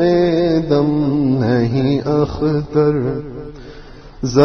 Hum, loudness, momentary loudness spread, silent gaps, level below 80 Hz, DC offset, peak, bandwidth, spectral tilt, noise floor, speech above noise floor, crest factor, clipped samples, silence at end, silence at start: none; -16 LUFS; 13 LU; none; -38 dBFS; under 0.1%; 0 dBFS; 6.6 kHz; -8 dB/octave; -36 dBFS; 20 dB; 16 dB; under 0.1%; 0 s; 0 s